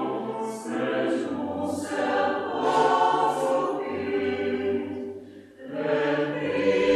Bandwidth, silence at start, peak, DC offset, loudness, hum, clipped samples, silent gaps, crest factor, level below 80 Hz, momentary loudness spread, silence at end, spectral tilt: 13 kHz; 0 s; -10 dBFS; under 0.1%; -26 LUFS; none; under 0.1%; none; 16 dB; -68 dBFS; 10 LU; 0 s; -5 dB/octave